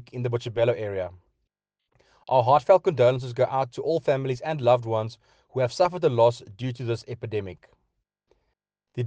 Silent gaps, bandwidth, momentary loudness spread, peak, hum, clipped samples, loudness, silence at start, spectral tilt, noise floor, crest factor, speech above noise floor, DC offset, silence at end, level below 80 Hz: none; 9 kHz; 13 LU; -6 dBFS; none; under 0.1%; -24 LUFS; 0 s; -7 dB/octave; -81 dBFS; 20 dB; 57 dB; under 0.1%; 0 s; -66 dBFS